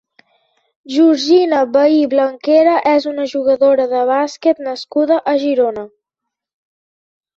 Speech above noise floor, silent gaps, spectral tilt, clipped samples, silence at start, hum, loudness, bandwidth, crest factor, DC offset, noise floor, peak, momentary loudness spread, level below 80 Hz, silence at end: 67 dB; none; -4 dB/octave; under 0.1%; 0.9 s; none; -14 LUFS; 7.8 kHz; 14 dB; under 0.1%; -81 dBFS; -2 dBFS; 8 LU; -62 dBFS; 1.5 s